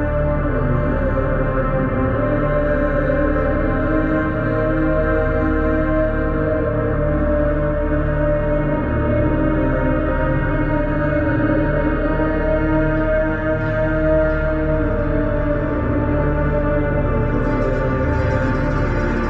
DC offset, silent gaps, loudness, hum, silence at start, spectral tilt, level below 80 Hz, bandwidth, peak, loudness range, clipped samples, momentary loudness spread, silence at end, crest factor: under 0.1%; none; -19 LUFS; none; 0 s; -10 dB/octave; -24 dBFS; 6 kHz; -4 dBFS; 1 LU; under 0.1%; 2 LU; 0 s; 12 dB